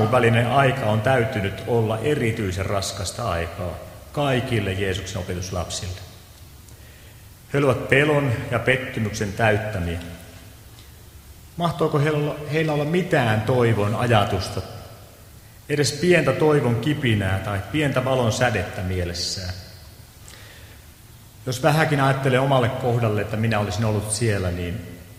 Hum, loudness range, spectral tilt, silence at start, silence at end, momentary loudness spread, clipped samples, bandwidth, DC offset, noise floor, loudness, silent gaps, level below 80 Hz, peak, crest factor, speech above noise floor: none; 6 LU; -5.5 dB/octave; 0 s; 0 s; 14 LU; under 0.1%; 16 kHz; under 0.1%; -45 dBFS; -22 LUFS; none; -46 dBFS; 0 dBFS; 22 dB; 24 dB